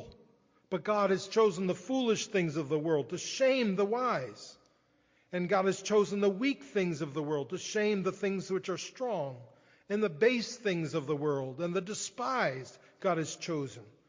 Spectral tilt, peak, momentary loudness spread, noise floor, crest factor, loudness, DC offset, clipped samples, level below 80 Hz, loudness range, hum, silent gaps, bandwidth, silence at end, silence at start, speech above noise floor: -5 dB/octave; -14 dBFS; 9 LU; -70 dBFS; 18 dB; -32 LUFS; under 0.1%; under 0.1%; -74 dBFS; 4 LU; none; none; 7.6 kHz; 0.2 s; 0 s; 38 dB